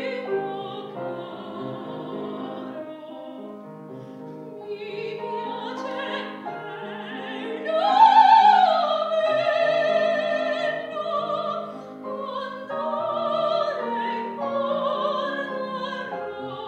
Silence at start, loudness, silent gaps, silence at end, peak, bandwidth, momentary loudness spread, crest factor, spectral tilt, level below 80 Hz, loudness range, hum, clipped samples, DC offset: 0 s; -24 LUFS; none; 0 s; -4 dBFS; 8.4 kHz; 18 LU; 20 dB; -5 dB/octave; -78 dBFS; 16 LU; none; under 0.1%; under 0.1%